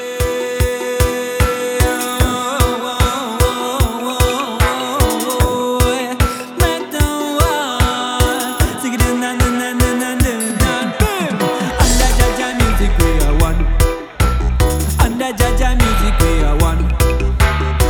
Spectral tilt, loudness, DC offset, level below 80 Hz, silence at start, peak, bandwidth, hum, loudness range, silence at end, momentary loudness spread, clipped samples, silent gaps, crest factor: -4.5 dB/octave; -16 LUFS; under 0.1%; -18 dBFS; 0 s; 0 dBFS; over 20 kHz; none; 1 LU; 0 s; 3 LU; under 0.1%; none; 14 dB